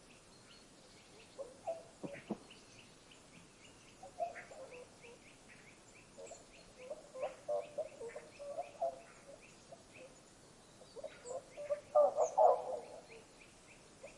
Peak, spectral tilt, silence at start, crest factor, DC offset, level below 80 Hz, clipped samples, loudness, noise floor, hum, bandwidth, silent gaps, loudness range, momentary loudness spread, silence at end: -18 dBFS; -4 dB/octave; 0.05 s; 24 dB; under 0.1%; -74 dBFS; under 0.1%; -40 LUFS; -62 dBFS; none; 11.5 kHz; none; 15 LU; 26 LU; 0 s